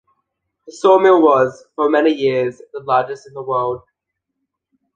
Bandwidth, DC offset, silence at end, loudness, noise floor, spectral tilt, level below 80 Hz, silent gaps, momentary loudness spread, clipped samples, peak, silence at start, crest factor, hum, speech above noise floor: 9 kHz; under 0.1%; 1.2 s; -16 LUFS; -78 dBFS; -6 dB/octave; -62 dBFS; none; 16 LU; under 0.1%; -2 dBFS; 0.7 s; 16 dB; none; 63 dB